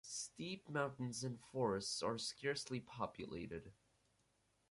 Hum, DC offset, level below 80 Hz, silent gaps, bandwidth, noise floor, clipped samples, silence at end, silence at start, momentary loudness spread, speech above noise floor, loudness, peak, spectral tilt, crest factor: none; under 0.1%; -72 dBFS; none; 11.5 kHz; -80 dBFS; under 0.1%; 0.95 s; 0.05 s; 8 LU; 36 dB; -44 LUFS; -26 dBFS; -4 dB/octave; 20 dB